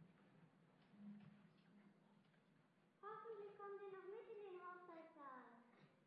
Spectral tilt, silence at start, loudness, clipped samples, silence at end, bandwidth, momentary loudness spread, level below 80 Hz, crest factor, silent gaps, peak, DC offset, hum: -5 dB/octave; 0 s; -59 LUFS; under 0.1%; 0 s; 5.2 kHz; 8 LU; under -90 dBFS; 16 dB; none; -46 dBFS; under 0.1%; none